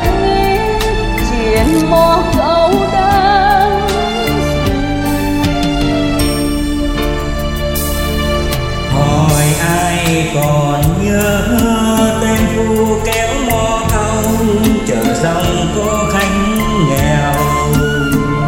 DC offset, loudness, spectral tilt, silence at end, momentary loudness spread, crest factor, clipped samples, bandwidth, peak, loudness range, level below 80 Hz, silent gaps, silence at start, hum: under 0.1%; -13 LUFS; -5 dB/octave; 0 s; 5 LU; 12 dB; under 0.1%; 17 kHz; 0 dBFS; 4 LU; -22 dBFS; none; 0 s; none